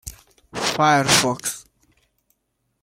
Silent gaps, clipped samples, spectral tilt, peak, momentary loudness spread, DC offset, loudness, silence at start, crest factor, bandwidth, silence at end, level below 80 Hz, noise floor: none; under 0.1%; -2.5 dB/octave; -2 dBFS; 21 LU; under 0.1%; -18 LUFS; 0.05 s; 20 dB; 16.5 kHz; 1.2 s; -52 dBFS; -73 dBFS